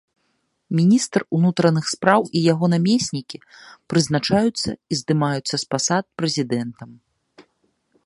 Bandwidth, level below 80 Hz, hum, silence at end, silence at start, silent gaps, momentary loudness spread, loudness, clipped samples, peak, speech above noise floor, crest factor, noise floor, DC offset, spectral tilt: 11.5 kHz; -56 dBFS; none; 0.65 s; 0.7 s; none; 9 LU; -20 LUFS; under 0.1%; 0 dBFS; 50 dB; 20 dB; -70 dBFS; under 0.1%; -5 dB/octave